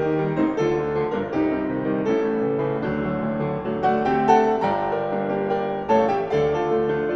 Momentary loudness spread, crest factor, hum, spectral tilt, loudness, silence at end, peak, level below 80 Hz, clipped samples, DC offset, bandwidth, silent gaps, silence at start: 6 LU; 18 dB; none; -7.5 dB/octave; -22 LUFS; 0 s; -4 dBFS; -50 dBFS; under 0.1%; under 0.1%; 7 kHz; none; 0 s